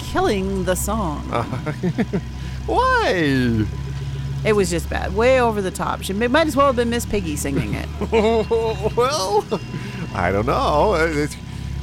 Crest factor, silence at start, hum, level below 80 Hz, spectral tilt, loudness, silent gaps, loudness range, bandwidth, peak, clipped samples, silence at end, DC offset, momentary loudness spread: 16 dB; 0 s; none; -32 dBFS; -5.5 dB/octave; -20 LUFS; none; 2 LU; 16.5 kHz; -4 dBFS; under 0.1%; 0 s; under 0.1%; 10 LU